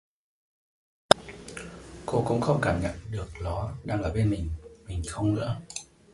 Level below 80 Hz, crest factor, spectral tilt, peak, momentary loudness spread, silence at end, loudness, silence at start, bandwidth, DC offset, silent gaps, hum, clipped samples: -42 dBFS; 30 dB; -5.5 dB/octave; 0 dBFS; 17 LU; 0.3 s; -28 LUFS; 1.1 s; 11.5 kHz; under 0.1%; none; none; under 0.1%